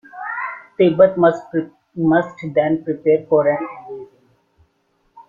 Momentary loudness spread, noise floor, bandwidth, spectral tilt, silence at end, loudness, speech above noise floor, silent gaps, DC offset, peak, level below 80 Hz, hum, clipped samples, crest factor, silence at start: 17 LU; -64 dBFS; 7.2 kHz; -8.5 dB/octave; 0.1 s; -18 LUFS; 48 dB; none; under 0.1%; -2 dBFS; -60 dBFS; none; under 0.1%; 18 dB; 0.15 s